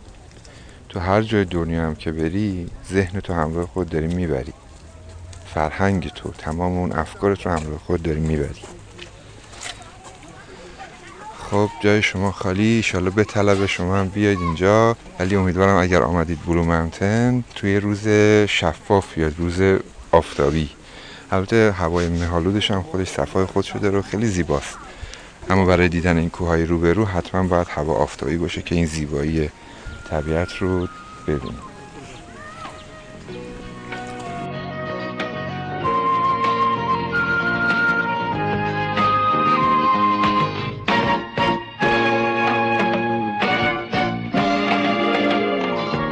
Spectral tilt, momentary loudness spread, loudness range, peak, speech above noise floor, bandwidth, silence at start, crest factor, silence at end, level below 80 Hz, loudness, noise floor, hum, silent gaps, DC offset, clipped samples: -6 dB/octave; 19 LU; 9 LU; -2 dBFS; 22 dB; 10 kHz; 0 s; 18 dB; 0 s; -38 dBFS; -20 LUFS; -42 dBFS; none; none; under 0.1%; under 0.1%